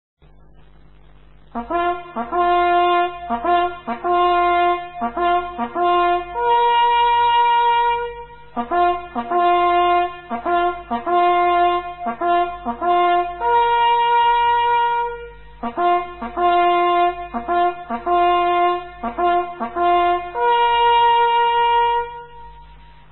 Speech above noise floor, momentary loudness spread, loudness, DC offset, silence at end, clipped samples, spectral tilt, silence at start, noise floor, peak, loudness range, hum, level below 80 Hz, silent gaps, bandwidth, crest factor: 28 dB; 10 LU; -18 LUFS; 0.5%; 0.4 s; under 0.1%; -1 dB/octave; 1.55 s; -48 dBFS; -6 dBFS; 2 LU; none; -46 dBFS; none; 4.1 kHz; 12 dB